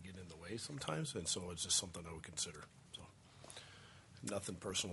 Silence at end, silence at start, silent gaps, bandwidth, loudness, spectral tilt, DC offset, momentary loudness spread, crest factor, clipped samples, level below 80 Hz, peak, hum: 0 s; 0 s; none; 11.5 kHz; -42 LUFS; -2.5 dB/octave; under 0.1%; 21 LU; 22 dB; under 0.1%; -72 dBFS; -24 dBFS; none